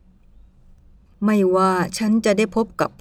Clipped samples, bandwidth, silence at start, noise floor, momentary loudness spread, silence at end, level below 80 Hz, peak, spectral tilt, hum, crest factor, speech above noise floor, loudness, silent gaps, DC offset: under 0.1%; 13.5 kHz; 1.2 s; -50 dBFS; 6 LU; 0.1 s; -50 dBFS; -6 dBFS; -5.5 dB/octave; none; 14 dB; 31 dB; -19 LUFS; none; under 0.1%